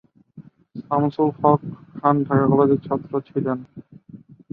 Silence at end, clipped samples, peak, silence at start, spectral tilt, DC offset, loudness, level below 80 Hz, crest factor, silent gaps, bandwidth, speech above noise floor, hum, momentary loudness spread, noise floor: 0.35 s; under 0.1%; -2 dBFS; 0.35 s; -12 dB/octave; under 0.1%; -21 LUFS; -60 dBFS; 20 dB; none; 4.8 kHz; 26 dB; none; 17 LU; -46 dBFS